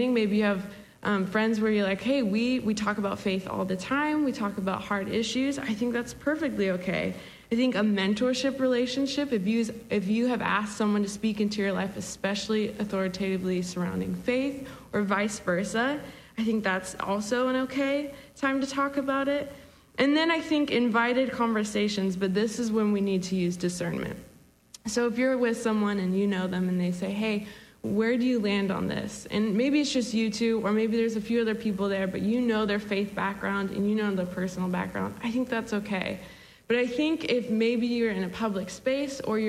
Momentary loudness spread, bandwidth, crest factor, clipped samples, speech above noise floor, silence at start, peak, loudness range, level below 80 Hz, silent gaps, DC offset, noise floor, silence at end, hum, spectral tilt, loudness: 6 LU; 14.5 kHz; 16 dB; under 0.1%; 26 dB; 0 s; -12 dBFS; 3 LU; -60 dBFS; none; under 0.1%; -53 dBFS; 0 s; none; -5.5 dB/octave; -28 LUFS